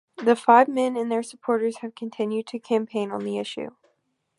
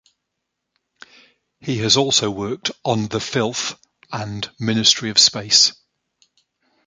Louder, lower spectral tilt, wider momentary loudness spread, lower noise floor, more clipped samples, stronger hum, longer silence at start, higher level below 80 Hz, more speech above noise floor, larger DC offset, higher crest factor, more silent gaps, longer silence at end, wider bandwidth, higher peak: second, -23 LUFS vs -17 LUFS; first, -5 dB/octave vs -2.5 dB/octave; about the same, 17 LU vs 15 LU; second, -72 dBFS vs -79 dBFS; neither; neither; second, 0.2 s vs 1.65 s; second, -76 dBFS vs -56 dBFS; second, 49 dB vs 59 dB; neither; about the same, 22 dB vs 22 dB; neither; second, 0.7 s vs 1.15 s; first, 11.5 kHz vs 10 kHz; about the same, -2 dBFS vs 0 dBFS